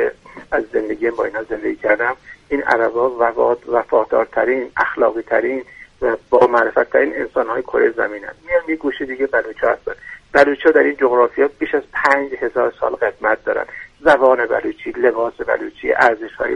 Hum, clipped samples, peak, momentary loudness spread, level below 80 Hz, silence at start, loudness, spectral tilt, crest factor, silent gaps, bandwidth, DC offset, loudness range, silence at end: none; under 0.1%; 0 dBFS; 9 LU; -50 dBFS; 0 s; -17 LUFS; -5.5 dB/octave; 18 dB; none; 9.6 kHz; under 0.1%; 3 LU; 0 s